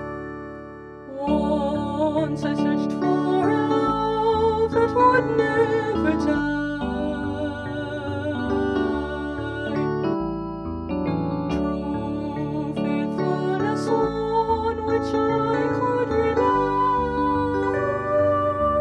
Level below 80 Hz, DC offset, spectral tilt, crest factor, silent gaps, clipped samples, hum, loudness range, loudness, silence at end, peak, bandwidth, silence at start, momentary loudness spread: -42 dBFS; under 0.1%; -7.5 dB/octave; 16 dB; none; under 0.1%; none; 6 LU; -23 LUFS; 0 s; -6 dBFS; 9.6 kHz; 0 s; 8 LU